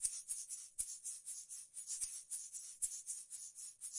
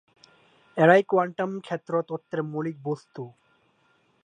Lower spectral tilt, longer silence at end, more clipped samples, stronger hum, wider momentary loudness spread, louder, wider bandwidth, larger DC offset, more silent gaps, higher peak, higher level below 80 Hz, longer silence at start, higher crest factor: second, 3.5 dB/octave vs -7.5 dB/octave; second, 0 s vs 0.95 s; neither; neither; second, 7 LU vs 19 LU; second, -44 LUFS vs -25 LUFS; first, 12 kHz vs 9.6 kHz; neither; neither; second, -22 dBFS vs -4 dBFS; about the same, -76 dBFS vs -78 dBFS; second, 0 s vs 0.75 s; about the same, 24 dB vs 24 dB